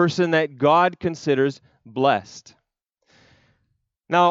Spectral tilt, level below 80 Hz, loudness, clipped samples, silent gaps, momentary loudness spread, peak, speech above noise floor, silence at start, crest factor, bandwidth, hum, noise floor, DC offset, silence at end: -6 dB/octave; -66 dBFS; -21 LUFS; under 0.1%; none; 14 LU; -4 dBFS; 54 dB; 0 s; 18 dB; 7.8 kHz; none; -75 dBFS; under 0.1%; 0 s